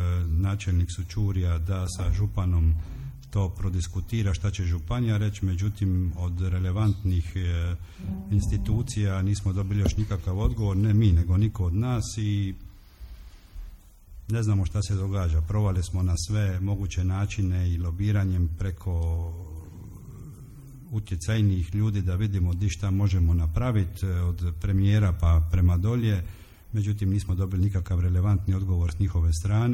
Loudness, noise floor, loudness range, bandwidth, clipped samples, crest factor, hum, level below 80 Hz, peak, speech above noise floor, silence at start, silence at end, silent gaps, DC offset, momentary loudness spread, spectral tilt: -26 LUFS; -46 dBFS; 5 LU; 12 kHz; under 0.1%; 16 dB; none; -34 dBFS; -10 dBFS; 22 dB; 0 s; 0 s; none; under 0.1%; 11 LU; -7 dB/octave